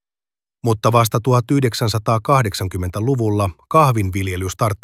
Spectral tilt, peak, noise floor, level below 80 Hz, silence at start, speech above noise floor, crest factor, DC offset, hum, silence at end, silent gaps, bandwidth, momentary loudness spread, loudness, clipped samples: -6 dB/octave; -2 dBFS; under -90 dBFS; -46 dBFS; 0.65 s; over 73 dB; 16 dB; under 0.1%; none; 0.05 s; none; 16 kHz; 7 LU; -18 LUFS; under 0.1%